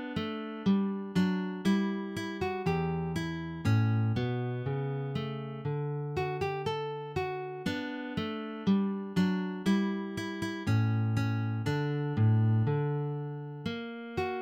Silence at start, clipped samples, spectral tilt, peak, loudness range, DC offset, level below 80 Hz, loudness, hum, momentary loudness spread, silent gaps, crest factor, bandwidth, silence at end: 0 s; under 0.1%; -7.5 dB/octave; -16 dBFS; 4 LU; under 0.1%; -60 dBFS; -32 LUFS; none; 8 LU; none; 14 dB; 10 kHz; 0 s